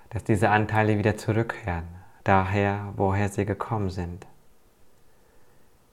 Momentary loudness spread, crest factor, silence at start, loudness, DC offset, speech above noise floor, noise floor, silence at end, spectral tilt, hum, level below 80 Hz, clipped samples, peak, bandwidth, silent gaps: 12 LU; 22 dB; 0.1 s; -25 LUFS; under 0.1%; 30 dB; -54 dBFS; 0.5 s; -7 dB/octave; none; -50 dBFS; under 0.1%; -6 dBFS; 13 kHz; none